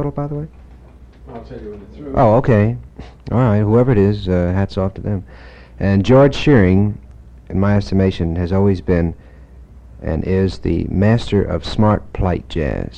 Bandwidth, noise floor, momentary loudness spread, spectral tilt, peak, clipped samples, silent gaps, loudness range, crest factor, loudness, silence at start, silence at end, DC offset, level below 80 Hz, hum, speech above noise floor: 8.4 kHz; -41 dBFS; 18 LU; -8.5 dB/octave; 0 dBFS; under 0.1%; none; 4 LU; 16 dB; -16 LUFS; 0 s; 0 s; under 0.1%; -32 dBFS; none; 25 dB